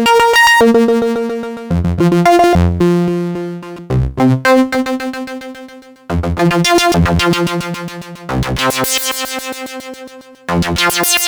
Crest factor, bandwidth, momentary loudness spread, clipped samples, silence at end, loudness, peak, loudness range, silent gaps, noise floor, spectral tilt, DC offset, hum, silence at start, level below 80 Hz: 14 dB; over 20 kHz; 17 LU; under 0.1%; 0 s; -13 LUFS; 0 dBFS; 5 LU; none; -35 dBFS; -4.5 dB/octave; under 0.1%; none; 0 s; -30 dBFS